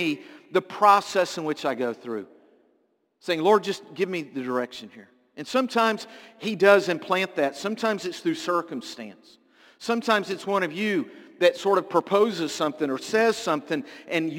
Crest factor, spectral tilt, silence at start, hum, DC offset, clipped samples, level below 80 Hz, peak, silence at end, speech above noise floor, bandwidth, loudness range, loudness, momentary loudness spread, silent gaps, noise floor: 22 dB; -4.5 dB/octave; 0 s; none; under 0.1%; under 0.1%; -76 dBFS; -4 dBFS; 0 s; 44 dB; 17 kHz; 4 LU; -25 LUFS; 14 LU; none; -69 dBFS